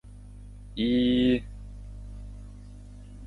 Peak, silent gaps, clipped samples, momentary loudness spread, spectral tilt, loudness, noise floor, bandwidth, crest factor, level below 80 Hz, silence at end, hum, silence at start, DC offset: -14 dBFS; none; under 0.1%; 24 LU; -7.5 dB/octave; -25 LUFS; -45 dBFS; 4.6 kHz; 16 dB; -44 dBFS; 0 s; 50 Hz at -40 dBFS; 0.05 s; under 0.1%